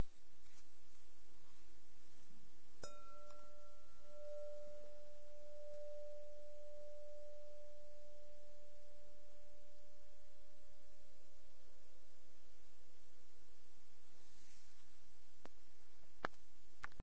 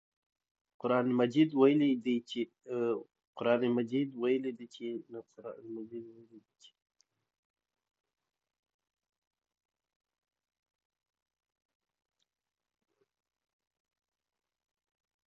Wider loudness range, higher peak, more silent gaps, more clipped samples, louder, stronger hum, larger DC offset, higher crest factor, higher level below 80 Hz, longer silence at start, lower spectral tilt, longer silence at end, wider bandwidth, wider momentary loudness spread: second, 12 LU vs 20 LU; second, -24 dBFS vs -12 dBFS; second, none vs 3.27-3.33 s; neither; second, -59 LUFS vs -32 LUFS; neither; first, 1% vs under 0.1%; about the same, 28 dB vs 24 dB; first, -74 dBFS vs -86 dBFS; second, 0 s vs 0.85 s; second, -4.5 dB/octave vs -7.5 dB/octave; second, 0 s vs 8.9 s; about the same, 8 kHz vs 7.8 kHz; second, 16 LU vs 20 LU